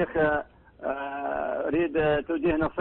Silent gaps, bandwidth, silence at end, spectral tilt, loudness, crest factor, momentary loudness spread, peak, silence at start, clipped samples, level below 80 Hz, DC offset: none; 4.2 kHz; 0 s; -10.5 dB/octave; -27 LUFS; 12 dB; 9 LU; -14 dBFS; 0 s; under 0.1%; -48 dBFS; under 0.1%